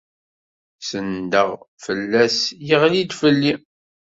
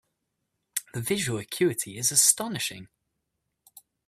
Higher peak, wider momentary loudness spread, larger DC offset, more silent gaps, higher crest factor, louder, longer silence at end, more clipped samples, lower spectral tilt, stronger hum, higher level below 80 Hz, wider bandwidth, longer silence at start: about the same, -2 dBFS vs -2 dBFS; about the same, 12 LU vs 14 LU; neither; first, 1.68-1.77 s vs none; second, 18 dB vs 28 dB; first, -19 LUFS vs -25 LUFS; second, 0.55 s vs 1.2 s; neither; first, -4.5 dB/octave vs -2.5 dB/octave; neither; first, -60 dBFS vs -66 dBFS; second, 8 kHz vs 16 kHz; about the same, 0.8 s vs 0.75 s